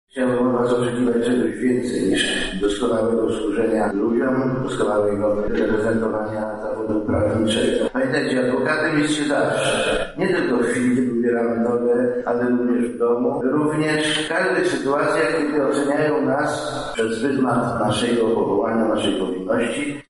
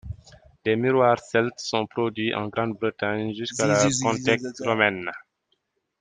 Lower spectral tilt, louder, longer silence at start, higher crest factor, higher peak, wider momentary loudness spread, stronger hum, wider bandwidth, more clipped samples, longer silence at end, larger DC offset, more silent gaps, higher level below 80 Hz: about the same, -5 dB/octave vs -4.5 dB/octave; first, -20 LUFS vs -24 LUFS; about the same, 0.15 s vs 0.05 s; second, 12 dB vs 22 dB; second, -8 dBFS vs -2 dBFS; second, 3 LU vs 11 LU; neither; first, 11.5 kHz vs 10 kHz; neither; second, 0.1 s vs 0.8 s; neither; neither; first, -44 dBFS vs -56 dBFS